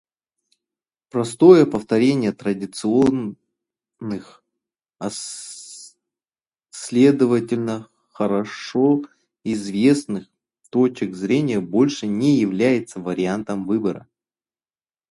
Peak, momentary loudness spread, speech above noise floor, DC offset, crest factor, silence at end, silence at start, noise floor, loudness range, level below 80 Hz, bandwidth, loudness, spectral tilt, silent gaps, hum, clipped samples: 0 dBFS; 17 LU; over 71 dB; under 0.1%; 20 dB; 1.15 s; 1.15 s; under -90 dBFS; 7 LU; -60 dBFS; 11.5 kHz; -20 LUFS; -6 dB/octave; none; none; under 0.1%